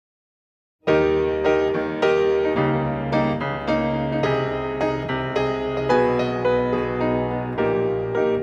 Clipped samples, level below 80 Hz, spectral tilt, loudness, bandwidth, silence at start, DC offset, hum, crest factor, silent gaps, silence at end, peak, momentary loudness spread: under 0.1%; -44 dBFS; -7.5 dB/octave; -22 LUFS; 7.4 kHz; 0.85 s; under 0.1%; none; 16 dB; none; 0 s; -6 dBFS; 5 LU